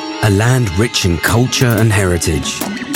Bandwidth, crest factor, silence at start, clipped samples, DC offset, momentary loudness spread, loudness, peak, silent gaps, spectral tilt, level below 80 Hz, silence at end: 17 kHz; 14 dB; 0 s; under 0.1%; under 0.1%; 5 LU; -14 LUFS; 0 dBFS; none; -4.5 dB/octave; -36 dBFS; 0 s